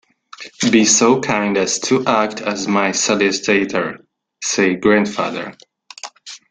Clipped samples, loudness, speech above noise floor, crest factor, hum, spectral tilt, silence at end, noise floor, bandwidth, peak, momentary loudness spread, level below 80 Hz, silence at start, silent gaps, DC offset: under 0.1%; -16 LUFS; 22 dB; 16 dB; none; -3 dB/octave; 0.15 s; -39 dBFS; 10 kHz; -2 dBFS; 20 LU; -56 dBFS; 0.4 s; none; under 0.1%